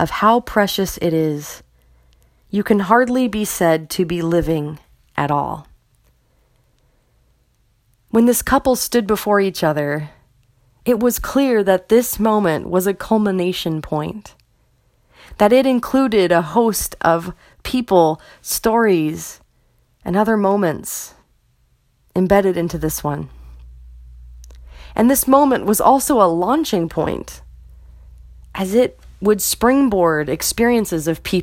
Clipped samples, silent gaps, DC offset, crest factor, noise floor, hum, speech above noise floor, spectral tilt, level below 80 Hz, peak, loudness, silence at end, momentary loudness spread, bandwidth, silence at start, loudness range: under 0.1%; none; under 0.1%; 18 dB; -60 dBFS; none; 43 dB; -5 dB/octave; -42 dBFS; 0 dBFS; -17 LUFS; 0 s; 13 LU; 16.5 kHz; 0 s; 6 LU